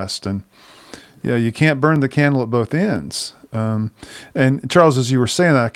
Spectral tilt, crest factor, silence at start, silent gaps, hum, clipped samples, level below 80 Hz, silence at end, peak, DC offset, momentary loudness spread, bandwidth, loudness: -6 dB/octave; 18 dB; 0 s; none; none; under 0.1%; -56 dBFS; 0.05 s; 0 dBFS; under 0.1%; 13 LU; 15.5 kHz; -17 LUFS